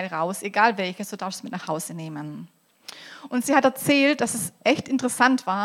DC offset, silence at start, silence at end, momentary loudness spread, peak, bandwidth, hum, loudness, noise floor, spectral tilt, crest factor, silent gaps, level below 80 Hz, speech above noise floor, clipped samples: under 0.1%; 0 s; 0 s; 20 LU; -2 dBFS; 16.5 kHz; none; -23 LUFS; -45 dBFS; -3.5 dB/octave; 22 dB; none; -70 dBFS; 22 dB; under 0.1%